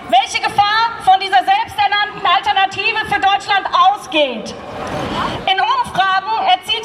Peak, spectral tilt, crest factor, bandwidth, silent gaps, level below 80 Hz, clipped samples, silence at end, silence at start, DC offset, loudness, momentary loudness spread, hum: 0 dBFS; -2.5 dB/octave; 14 dB; 13.5 kHz; none; -46 dBFS; under 0.1%; 0 s; 0 s; under 0.1%; -15 LUFS; 7 LU; none